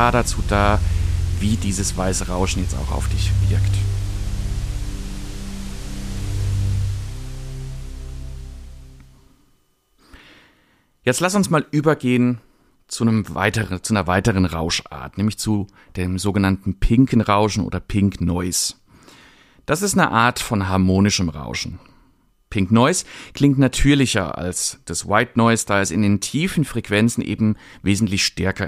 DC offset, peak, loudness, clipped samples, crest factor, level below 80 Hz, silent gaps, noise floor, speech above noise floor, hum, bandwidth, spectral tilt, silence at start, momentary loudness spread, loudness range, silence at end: under 0.1%; -2 dBFS; -20 LUFS; under 0.1%; 18 dB; -30 dBFS; none; -61 dBFS; 42 dB; none; 15.5 kHz; -5 dB/octave; 0 s; 16 LU; 9 LU; 0 s